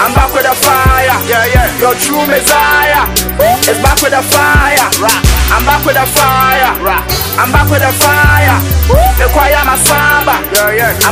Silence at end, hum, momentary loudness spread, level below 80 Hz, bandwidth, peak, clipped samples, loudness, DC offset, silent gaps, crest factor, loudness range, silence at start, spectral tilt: 0 s; none; 3 LU; -16 dBFS; over 20 kHz; 0 dBFS; 0.8%; -8 LUFS; under 0.1%; none; 8 dB; 1 LU; 0 s; -3.5 dB/octave